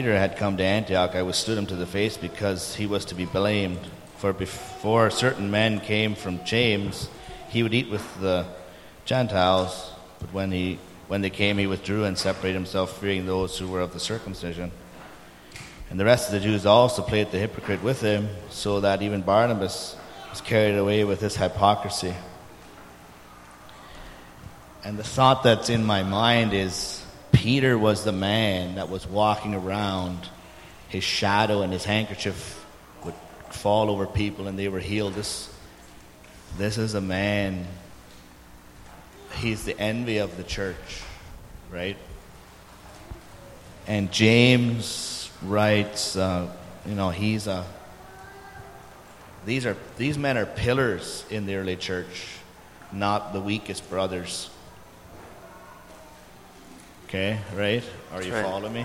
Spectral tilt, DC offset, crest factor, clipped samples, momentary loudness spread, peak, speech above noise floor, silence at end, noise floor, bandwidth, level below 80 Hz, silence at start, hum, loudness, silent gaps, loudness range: -5 dB/octave; under 0.1%; 24 dB; under 0.1%; 23 LU; -2 dBFS; 23 dB; 0 s; -48 dBFS; 16 kHz; -50 dBFS; 0 s; none; -25 LUFS; none; 8 LU